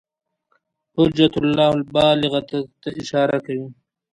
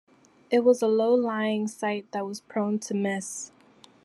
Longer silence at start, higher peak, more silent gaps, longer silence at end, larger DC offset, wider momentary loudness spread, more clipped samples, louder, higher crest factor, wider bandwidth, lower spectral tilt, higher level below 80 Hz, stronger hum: first, 0.95 s vs 0.5 s; first, -2 dBFS vs -8 dBFS; neither; second, 0.4 s vs 0.6 s; neither; about the same, 14 LU vs 12 LU; neither; first, -19 LUFS vs -26 LUFS; about the same, 18 dB vs 18 dB; second, 10.5 kHz vs 12.5 kHz; first, -6.5 dB/octave vs -5 dB/octave; first, -50 dBFS vs -78 dBFS; neither